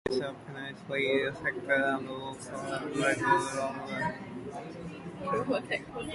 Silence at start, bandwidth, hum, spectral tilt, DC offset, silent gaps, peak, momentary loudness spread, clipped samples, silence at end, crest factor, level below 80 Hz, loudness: 0.05 s; 11.5 kHz; none; -4.5 dB/octave; under 0.1%; none; -12 dBFS; 13 LU; under 0.1%; 0 s; 20 dB; -62 dBFS; -32 LUFS